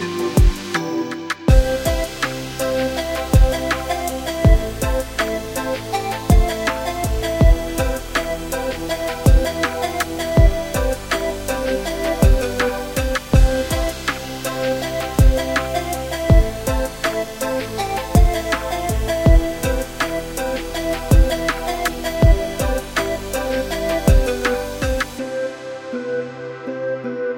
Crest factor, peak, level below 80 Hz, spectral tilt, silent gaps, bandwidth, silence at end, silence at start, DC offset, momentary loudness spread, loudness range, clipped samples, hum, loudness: 18 dB; 0 dBFS; -20 dBFS; -5.5 dB/octave; none; 17 kHz; 0 s; 0 s; under 0.1%; 8 LU; 1 LU; under 0.1%; none; -20 LUFS